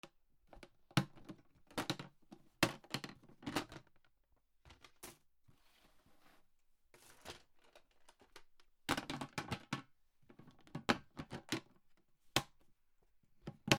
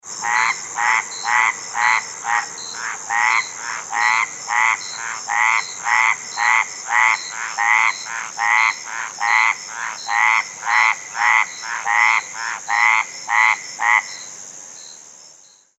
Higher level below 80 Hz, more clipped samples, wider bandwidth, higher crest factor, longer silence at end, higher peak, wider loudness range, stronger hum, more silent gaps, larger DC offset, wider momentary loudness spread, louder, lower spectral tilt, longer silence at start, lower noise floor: first, -68 dBFS vs -76 dBFS; neither; first, 19.5 kHz vs 14.5 kHz; first, 38 dB vs 18 dB; second, 0 s vs 0.5 s; second, -8 dBFS vs -2 dBFS; first, 19 LU vs 2 LU; neither; neither; neither; first, 24 LU vs 11 LU; second, -43 LUFS vs -18 LUFS; first, -4 dB/octave vs 2 dB/octave; about the same, 0.05 s vs 0.05 s; first, -75 dBFS vs -48 dBFS